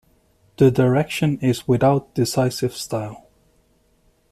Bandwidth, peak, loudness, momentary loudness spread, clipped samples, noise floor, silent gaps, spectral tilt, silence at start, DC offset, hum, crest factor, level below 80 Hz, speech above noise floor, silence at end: 14.5 kHz; -4 dBFS; -20 LUFS; 10 LU; under 0.1%; -61 dBFS; none; -6.5 dB/octave; 0.6 s; under 0.1%; none; 18 dB; -52 dBFS; 42 dB; 1.15 s